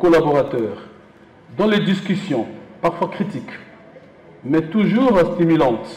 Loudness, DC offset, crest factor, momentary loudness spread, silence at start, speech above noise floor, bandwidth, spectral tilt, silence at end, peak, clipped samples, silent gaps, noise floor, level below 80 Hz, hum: -18 LUFS; under 0.1%; 10 dB; 17 LU; 0 s; 29 dB; 10.5 kHz; -7.5 dB/octave; 0 s; -8 dBFS; under 0.1%; none; -46 dBFS; -50 dBFS; none